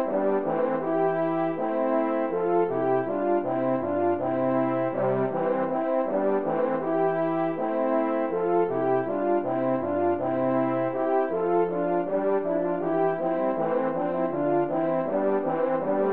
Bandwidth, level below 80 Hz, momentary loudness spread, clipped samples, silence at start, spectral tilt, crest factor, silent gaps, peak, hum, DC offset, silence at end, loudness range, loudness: 4.2 kHz; -70 dBFS; 2 LU; under 0.1%; 0 s; -11.5 dB/octave; 12 dB; none; -12 dBFS; none; 0.4%; 0 s; 0 LU; -26 LUFS